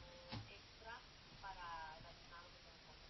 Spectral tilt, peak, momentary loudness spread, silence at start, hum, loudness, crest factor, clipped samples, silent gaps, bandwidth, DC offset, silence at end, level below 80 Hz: -2.5 dB/octave; -38 dBFS; 9 LU; 0 s; none; -55 LUFS; 18 dB; under 0.1%; none; 6 kHz; under 0.1%; 0 s; -68 dBFS